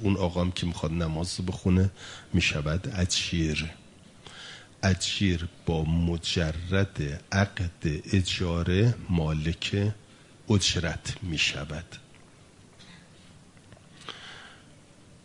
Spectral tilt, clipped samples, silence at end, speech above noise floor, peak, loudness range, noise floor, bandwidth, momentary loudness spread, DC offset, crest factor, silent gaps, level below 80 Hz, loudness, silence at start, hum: -5 dB/octave; under 0.1%; 0.65 s; 27 dB; -8 dBFS; 7 LU; -54 dBFS; 11 kHz; 18 LU; under 0.1%; 20 dB; none; -46 dBFS; -28 LUFS; 0 s; none